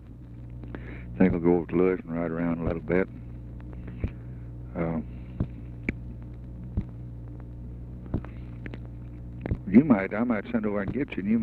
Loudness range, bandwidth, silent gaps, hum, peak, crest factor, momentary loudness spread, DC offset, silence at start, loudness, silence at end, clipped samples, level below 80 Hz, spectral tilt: 10 LU; 4.5 kHz; none; none; -6 dBFS; 22 dB; 18 LU; under 0.1%; 0 s; -28 LUFS; 0 s; under 0.1%; -42 dBFS; -10.5 dB/octave